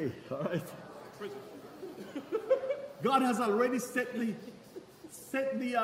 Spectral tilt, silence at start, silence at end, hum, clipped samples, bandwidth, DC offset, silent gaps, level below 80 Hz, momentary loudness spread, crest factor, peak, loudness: -5 dB/octave; 0 s; 0 s; none; under 0.1%; 16 kHz; under 0.1%; none; -76 dBFS; 20 LU; 20 dB; -14 dBFS; -33 LUFS